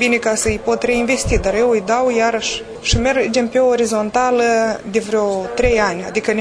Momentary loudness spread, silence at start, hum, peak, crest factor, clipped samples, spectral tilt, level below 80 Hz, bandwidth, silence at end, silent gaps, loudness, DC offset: 4 LU; 0 s; none; 0 dBFS; 16 dB; under 0.1%; -4 dB/octave; -32 dBFS; 11 kHz; 0 s; none; -16 LUFS; under 0.1%